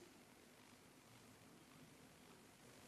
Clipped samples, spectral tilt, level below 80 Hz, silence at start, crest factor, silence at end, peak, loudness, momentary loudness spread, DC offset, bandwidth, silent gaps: under 0.1%; -3.5 dB/octave; -86 dBFS; 0 s; 18 dB; 0 s; -48 dBFS; -65 LUFS; 1 LU; under 0.1%; 13.5 kHz; none